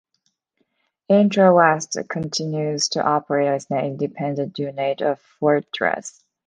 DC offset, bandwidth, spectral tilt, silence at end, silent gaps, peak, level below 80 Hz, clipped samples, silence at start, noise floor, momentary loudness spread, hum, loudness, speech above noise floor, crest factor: under 0.1%; 10 kHz; -5 dB/octave; 0.4 s; none; -2 dBFS; -66 dBFS; under 0.1%; 1.1 s; -71 dBFS; 11 LU; none; -20 LUFS; 51 dB; 20 dB